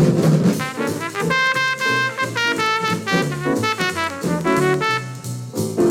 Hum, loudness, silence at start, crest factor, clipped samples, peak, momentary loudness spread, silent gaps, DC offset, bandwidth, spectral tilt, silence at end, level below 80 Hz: none; -19 LUFS; 0 s; 14 dB; under 0.1%; -4 dBFS; 7 LU; none; under 0.1%; 17 kHz; -5 dB/octave; 0 s; -54 dBFS